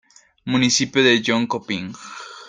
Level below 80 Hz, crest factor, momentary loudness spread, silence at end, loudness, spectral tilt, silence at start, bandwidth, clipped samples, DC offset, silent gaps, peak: -60 dBFS; 18 dB; 19 LU; 0 s; -18 LUFS; -3.5 dB/octave; 0.45 s; 9.6 kHz; under 0.1%; under 0.1%; none; -2 dBFS